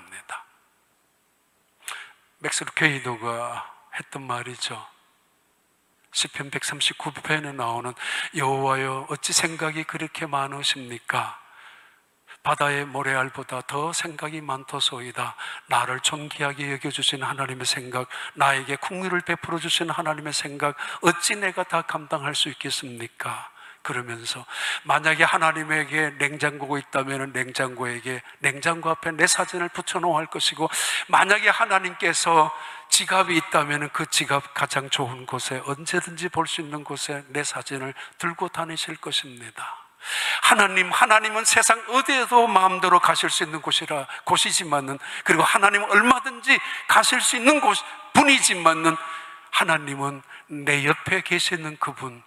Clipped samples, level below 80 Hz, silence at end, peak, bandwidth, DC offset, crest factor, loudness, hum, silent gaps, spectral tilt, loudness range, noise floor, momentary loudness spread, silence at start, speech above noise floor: under 0.1%; -70 dBFS; 0.05 s; -2 dBFS; 16 kHz; under 0.1%; 22 dB; -22 LUFS; none; none; -2 dB/octave; 10 LU; -66 dBFS; 14 LU; 0 s; 42 dB